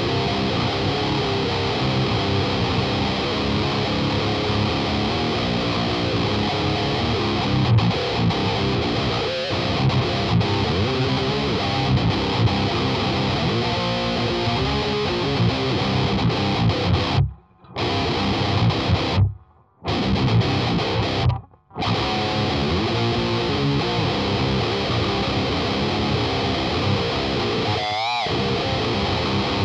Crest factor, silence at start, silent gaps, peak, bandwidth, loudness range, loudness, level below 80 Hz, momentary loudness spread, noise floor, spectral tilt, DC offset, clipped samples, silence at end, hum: 12 dB; 0 s; none; -8 dBFS; 9.6 kHz; 1 LU; -21 LUFS; -36 dBFS; 2 LU; -48 dBFS; -6 dB/octave; under 0.1%; under 0.1%; 0 s; none